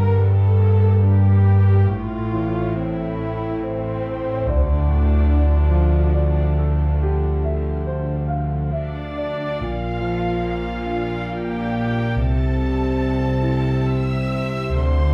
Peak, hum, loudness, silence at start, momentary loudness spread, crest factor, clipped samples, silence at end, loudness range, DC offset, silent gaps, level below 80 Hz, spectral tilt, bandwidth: -6 dBFS; none; -20 LUFS; 0 s; 9 LU; 12 dB; under 0.1%; 0 s; 6 LU; under 0.1%; none; -24 dBFS; -10 dB/octave; 5.6 kHz